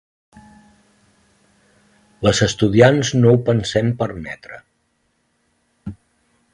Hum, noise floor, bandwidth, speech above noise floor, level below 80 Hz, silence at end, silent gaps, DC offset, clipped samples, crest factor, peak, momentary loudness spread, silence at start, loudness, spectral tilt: none; -66 dBFS; 11 kHz; 51 dB; -46 dBFS; 0.6 s; none; under 0.1%; under 0.1%; 20 dB; 0 dBFS; 23 LU; 2.2 s; -16 LUFS; -5.5 dB/octave